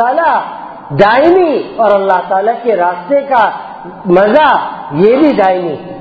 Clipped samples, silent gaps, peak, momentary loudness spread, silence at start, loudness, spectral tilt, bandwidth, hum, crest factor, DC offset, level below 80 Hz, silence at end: 0.5%; none; 0 dBFS; 13 LU; 0 s; -10 LUFS; -8 dB/octave; 7 kHz; none; 10 dB; under 0.1%; -48 dBFS; 0 s